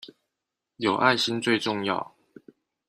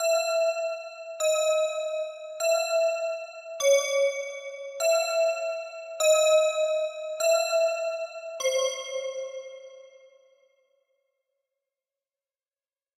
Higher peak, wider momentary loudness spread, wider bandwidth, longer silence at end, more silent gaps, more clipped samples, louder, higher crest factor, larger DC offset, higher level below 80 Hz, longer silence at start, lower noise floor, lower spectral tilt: first, -4 dBFS vs -12 dBFS; second, 9 LU vs 14 LU; second, 14 kHz vs 15.5 kHz; second, 0.8 s vs 3.1 s; neither; neither; about the same, -25 LUFS vs -26 LUFS; first, 24 dB vs 16 dB; neither; first, -70 dBFS vs under -90 dBFS; about the same, 0.05 s vs 0 s; second, -85 dBFS vs under -90 dBFS; first, -4 dB/octave vs 3.5 dB/octave